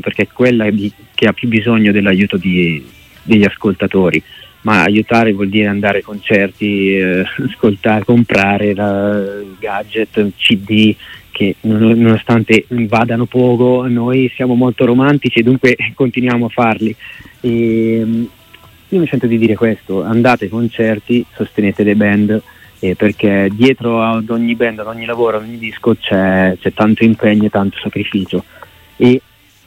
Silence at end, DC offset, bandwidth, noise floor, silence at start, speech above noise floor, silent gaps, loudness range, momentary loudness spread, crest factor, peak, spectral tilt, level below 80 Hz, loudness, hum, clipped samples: 0.5 s; under 0.1%; 15.5 kHz; -42 dBFS; 0.05 s; 29 dB; none; 3 LU; 8 LU; 12 dB; 0 dBFS; -7.5 dB/octave; -50 dBFS; -13 LUFS; none; under 0.1%